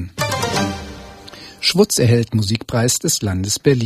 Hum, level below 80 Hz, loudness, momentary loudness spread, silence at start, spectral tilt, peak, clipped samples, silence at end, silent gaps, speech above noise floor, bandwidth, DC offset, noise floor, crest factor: none; -44 dBFS; -17 LUFS; 21 LU; 0 s; -4 dB/octave; 0 dBFS; under 0.1%; 0 s; none; 22 dB; 15.5 kHz; under 0.1%; -38 dBFS; 18 dB